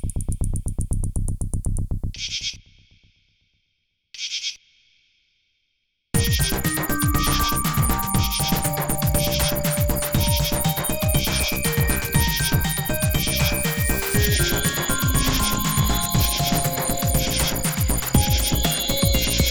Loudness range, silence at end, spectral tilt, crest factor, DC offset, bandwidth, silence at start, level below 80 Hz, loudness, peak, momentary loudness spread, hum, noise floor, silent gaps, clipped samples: 10 LU; 0 s; -3.5 dB/octave; 18 dB; under 0.1%; over 20 kHz; 0 s; -28 dBFS; -21 LUFS; -4 dBFS; 8 LU; none; -73 dBFS; none; under 0.1%